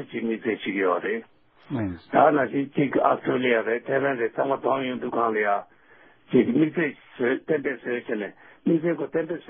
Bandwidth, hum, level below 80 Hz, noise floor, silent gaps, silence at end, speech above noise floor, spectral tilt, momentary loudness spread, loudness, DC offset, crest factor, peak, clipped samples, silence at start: 4.3 kHz; none; -62 dBFS; -55 dBFS; none; 0.1 s; 31 dB; -11 dB/octave; 10 LU; -25 LUFS; under 0.1%; 20 dB; -4 dBFS; under 0.1%; 0 s